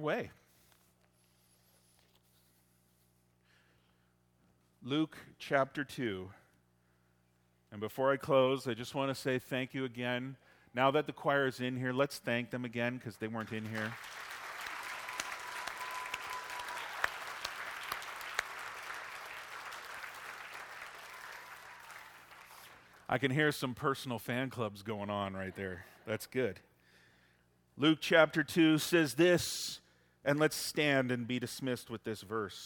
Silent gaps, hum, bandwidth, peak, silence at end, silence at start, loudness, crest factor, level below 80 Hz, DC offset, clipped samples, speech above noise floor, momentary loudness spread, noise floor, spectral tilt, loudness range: none; 60 Hz at -70 dBFS; 18 kHz; -10 dBFS; 0 s; 0 s; -35 LUFS; 26 dB; -74 dBFS; under 0.1%; under 0.1%; 38 dB; 18 LU; -72 dBFS; -4.5 dB/octave; 13 LU